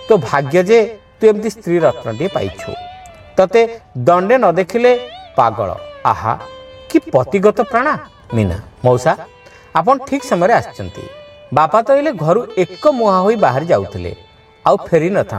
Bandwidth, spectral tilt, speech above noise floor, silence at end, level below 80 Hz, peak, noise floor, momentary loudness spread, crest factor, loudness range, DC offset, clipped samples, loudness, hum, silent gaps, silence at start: 13.5 kHz; -6.5 dB/octave; 22 dB; 0 s; -46 dBFS; 0 dBFS; -36 dBFS; 12 LU; 14 dB; 2 LU; under 0.1%; under 0.1%; -15 LUFS; none; none; 0 s